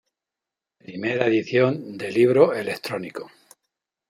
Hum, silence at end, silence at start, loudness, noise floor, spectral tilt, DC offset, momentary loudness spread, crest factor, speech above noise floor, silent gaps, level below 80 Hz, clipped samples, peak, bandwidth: none; 0.8 s; 0.9 s; -22 LUFS; -88 dBFS; -6.5 dB/octave; under 0.1%; 16 LU; 20 dB; 66 dB; none; -72 dBFS; under 0.1%; -2 dBFS; 14.5 kHz